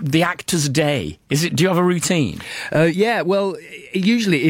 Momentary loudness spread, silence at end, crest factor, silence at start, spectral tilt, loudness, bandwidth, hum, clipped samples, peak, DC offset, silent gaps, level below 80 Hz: 8 LU; 0 s; 14 dB; 0 s; -5 dB/octave; -19 LUFS; 17 kHz; none; under 0.1%; -4 dBFS; under 0.1%; none; -52 dBFS